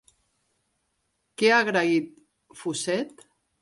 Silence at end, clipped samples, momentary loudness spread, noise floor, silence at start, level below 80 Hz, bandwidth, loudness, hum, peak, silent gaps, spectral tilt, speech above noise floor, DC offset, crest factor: 0.55 s; under 0.1%; 19 LU; -75 dBFS; 1.4 s; -76 dBFS; 11.5 kHz; -24 LUFS; none; -8 dBFS; none; -3.5 dB/octave; 51 dB; under 0.1%; 20 dB